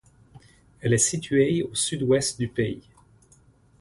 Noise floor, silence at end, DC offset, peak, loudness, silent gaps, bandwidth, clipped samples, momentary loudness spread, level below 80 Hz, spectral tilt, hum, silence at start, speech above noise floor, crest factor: -58 dBFS; 1 s; under 0.1%; -8 dBFS; -24 LUFS; none; 11.5 kHz; under 0.1%; 8 LU; -54 dBFS; -4 dB/octave; none; 0.35 s; 34 dB; 18 dB